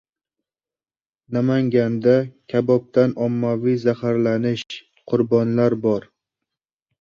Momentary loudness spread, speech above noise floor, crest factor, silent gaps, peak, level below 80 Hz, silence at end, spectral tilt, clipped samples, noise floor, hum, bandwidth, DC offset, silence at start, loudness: 7 LU; over 71 dB; 18 dB; none; -2 dBFS; -60 dBFS; 1 s; -8.5 dB/octave; under 0.1%; under -90 dBFS; none; 7.2 kHz; under 0.1%; 1.3 s; -20 LUFS